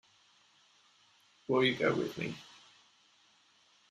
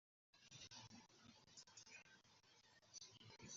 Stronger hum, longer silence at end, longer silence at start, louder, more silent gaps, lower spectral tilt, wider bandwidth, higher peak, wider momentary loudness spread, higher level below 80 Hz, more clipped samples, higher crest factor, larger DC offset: neither; first, 1.5 s vs 0 s; first, 1.5 s vs 0.35 s; first, -32 LUFS vs -62 LUFS; neither; first, -5.5 dB/octave vs -2 dB/octave; first, 13.5 kHz vs 7.4 kHz; first, -16 dBFS vs -46 dBFS; first, 21 LU vs 7 LU; first, -76 dBFS vs -90 dBFS; neither; about the same, 22 dB vs 20 dB; neither